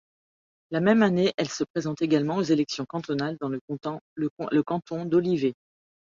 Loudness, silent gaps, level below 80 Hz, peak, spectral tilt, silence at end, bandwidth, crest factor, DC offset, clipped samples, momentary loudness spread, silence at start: -26 LUFS; 1.34-1.38 s, 1.70-1.74 s, 3.61-3.68 s, 4.01-4.16 s, 4.30-4.37 s; -68 dBFS; -8 dBFS; -6 dB/octave; 0.6 s; 7.6 kHz; 18 dB; under 0.1%; under 0.1%; 11 LU; 0.7 s